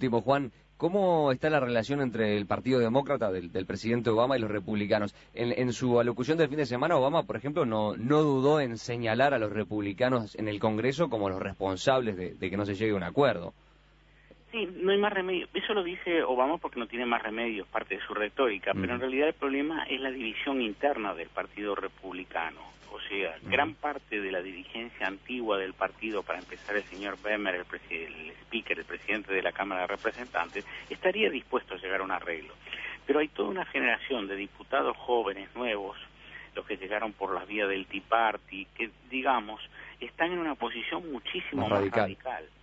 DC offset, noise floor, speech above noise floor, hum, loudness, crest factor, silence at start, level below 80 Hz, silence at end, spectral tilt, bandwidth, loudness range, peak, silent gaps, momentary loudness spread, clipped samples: under 0.1%; -60 dBFS; 30 dB; 50 Hz at -60 dBFS; -30 LUFS; 20 dB; 0 s; -60 dBFS; 0.15 s; -6 dB/octave; 8 kHz; 5 LU; -10 dBFS; none; 11 LU; under 0.1%